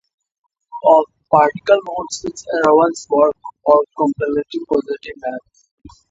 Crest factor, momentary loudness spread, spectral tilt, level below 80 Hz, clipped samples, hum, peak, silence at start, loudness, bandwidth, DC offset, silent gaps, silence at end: 18 dB; 14 LU; -5 dB/octave; -56 dBFS; under 0.1%; none; 0 dBFS; 0.75 s; -17 LUFS; 8 kHz; under 0.1%; 5.71-5.78 s; 0.25 s